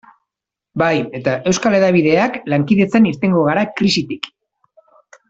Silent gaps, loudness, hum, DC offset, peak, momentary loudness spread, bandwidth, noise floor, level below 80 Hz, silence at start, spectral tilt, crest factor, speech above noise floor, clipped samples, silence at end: none; -15 LUFS; none; under 0.1%; 0 dBFS; 9 LU; 8 kHz; -84 dBFS; -54 dBFS; 0.75 s; -5.5 dB/octave; 16 dB; 69 dB; under 0.1%; 1 s